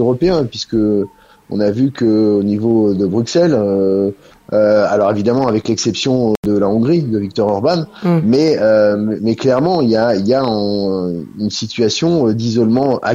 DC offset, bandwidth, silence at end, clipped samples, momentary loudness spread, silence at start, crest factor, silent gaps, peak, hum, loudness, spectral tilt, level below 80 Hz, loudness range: under 0.1%; 8 kHz; 0 s; under 0.1%; 6 LU; 0 s; 12 dB; 6.37-6.43 s; -2 dBFS; none; -14 LUFS; -6.5 dB/octave; -48 dBFS; 1 LU